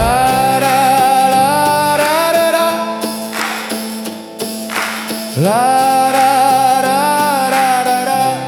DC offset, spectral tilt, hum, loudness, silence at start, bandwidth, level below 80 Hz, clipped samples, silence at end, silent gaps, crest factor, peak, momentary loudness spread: under 0.1%; -3.5 dB/octave; none; -13 LUFS; 0 s; over 20 kHz; -40 dBFS; under 0.1%; 0 s; none; 12 dB; 0 dBFS; 10 LU